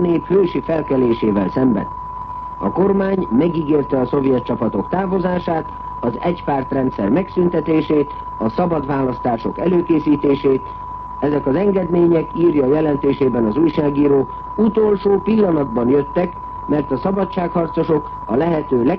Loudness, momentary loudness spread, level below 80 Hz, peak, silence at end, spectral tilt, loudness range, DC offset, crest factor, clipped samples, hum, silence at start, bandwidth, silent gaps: -17 LUFS; 7 LU; -40 dBFS; -6 dBFS; 0 s; -10.5 dB/octave; 3 LU; under 0.1%; 12 dB; under 0.1%; none; 0 s; 5.6 kHz; none